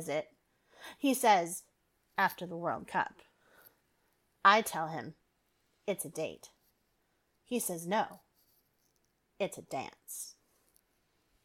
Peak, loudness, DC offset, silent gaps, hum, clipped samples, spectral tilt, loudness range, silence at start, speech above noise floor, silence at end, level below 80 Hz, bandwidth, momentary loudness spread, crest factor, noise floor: -10 dBFS; -33 LUFS; under 0.1%; none; none; under 0.1%; -3 dB/octave; 8 LU; 0 s; 44 dB; 1.15 s; -78 dBFS; 18 kHz; 17 LU; 26 dB; -77 dBFS